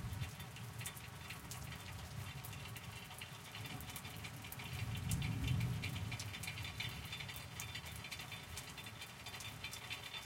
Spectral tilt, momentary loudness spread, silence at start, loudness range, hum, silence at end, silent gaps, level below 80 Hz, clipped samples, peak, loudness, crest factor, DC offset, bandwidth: -3.5 dB/octave; 9 LU; 0 s; 6 LU; none; 0 s; none; -58 dBFS; under 0.1%; -24 dBFS; -46 LUFS; 22 dB; under 0.1%; 17 kHz